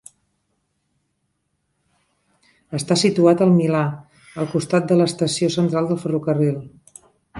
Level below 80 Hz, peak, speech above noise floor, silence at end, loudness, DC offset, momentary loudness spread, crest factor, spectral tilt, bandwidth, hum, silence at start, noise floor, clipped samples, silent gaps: -62 dBFS; -4 dBFS; 54 dB; 0 s; -19 LUFS; under 0.1%; 13 LU; 18 dB; -6 dB/octave; 11.5 kHz; none; 2.7 s; -72 dBFS; under 0.1%; none